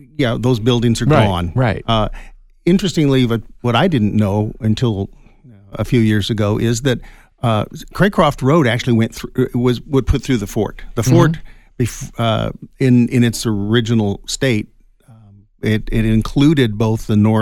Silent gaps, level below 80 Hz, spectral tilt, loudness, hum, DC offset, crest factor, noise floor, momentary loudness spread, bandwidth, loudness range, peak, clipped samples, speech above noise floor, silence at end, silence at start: none; -32 dBFS; -6.5 dB/octave; -16 LUFS; none; under 0.1%; 14 dB; -46 dBFS; 9 LU; 17 kHz; 2 LU; -2 dBFS; under 0.1%; 31 dB; 0 s; 0.2 s